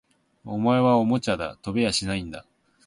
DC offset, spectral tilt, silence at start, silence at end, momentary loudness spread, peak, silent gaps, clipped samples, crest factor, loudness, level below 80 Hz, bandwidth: under 0.1%; -5.5 dB/octave; 0.45 s; 0.45 s; 14 LU; -8 dBFS; none; under 0.1%; 18 dB; -24 LUFS; -50 dBFS; 11.5 kHz